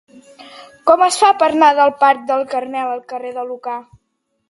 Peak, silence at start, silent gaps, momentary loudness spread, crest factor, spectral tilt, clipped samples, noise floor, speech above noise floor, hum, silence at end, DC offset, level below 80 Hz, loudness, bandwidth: 0 dBFS; 0.4 s; none; 15 LU; 16 dB; -2 dB/octave; under 0.1%; -70 dBFS; 55 dB; none; 0.65 s; under 0.1%; -62 dBFS; -15 LUFS; 11.5 kHz